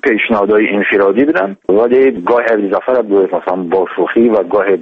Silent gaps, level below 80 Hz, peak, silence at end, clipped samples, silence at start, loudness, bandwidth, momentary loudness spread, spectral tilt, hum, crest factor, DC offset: none; -52 dBFS; 0 dBFS; 0 s; under 0.1%; 0.05 s; -12 LUFS; 5 kHz; 4 LU; -8 dB/octave; none; 12 dB; under 0.1%